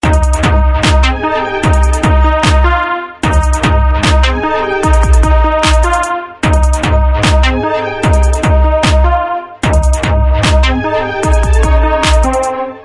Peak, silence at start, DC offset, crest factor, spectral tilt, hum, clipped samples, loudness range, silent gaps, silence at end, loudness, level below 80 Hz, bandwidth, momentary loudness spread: 0 dBFS; 0.05 s; under 0.1%; 10 dB; -5.5 dB/octave; none; under 0.1%; 1 LU; none; 0 s; -11 LUFS; -12 dBFS; 11.5 kHz; 4 LU